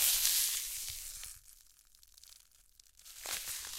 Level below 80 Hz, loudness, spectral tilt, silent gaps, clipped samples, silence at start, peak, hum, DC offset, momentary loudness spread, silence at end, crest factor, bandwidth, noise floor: -62 dBFS; -33 LUFS; 3 dB/octave; none; under 0.1%; 0 s; -8 dBFS; none; under 0.1%; 28 LU; 0 s; 30 dB; 16.5 kHz; -65 dBFS